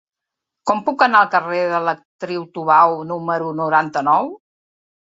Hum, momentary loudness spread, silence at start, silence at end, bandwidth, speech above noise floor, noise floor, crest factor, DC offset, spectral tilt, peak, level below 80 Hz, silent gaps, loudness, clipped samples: none; 13 LU; 0.65 s; 0.65 s; 8 kHz; 67 dB; -84 dBFS; 18 dB; under 0.1%; -5.5 dB/octave; -2 dBFS; -68 dBFS; 2.05-2.19 s; -17 LUFS; under 0.1%